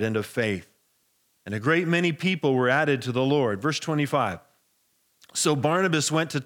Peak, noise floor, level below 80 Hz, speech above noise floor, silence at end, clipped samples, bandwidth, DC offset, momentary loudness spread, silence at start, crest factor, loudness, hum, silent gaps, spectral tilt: -8 dBFS; -69 dBFS; -74 dBFS; 45 dB; 0 s; under 0.1%; 18.5 kHz; under 0.1%; 7 LU; 0 s; 18 dB; -24 LUFS; none; none; -4.5 dB/octave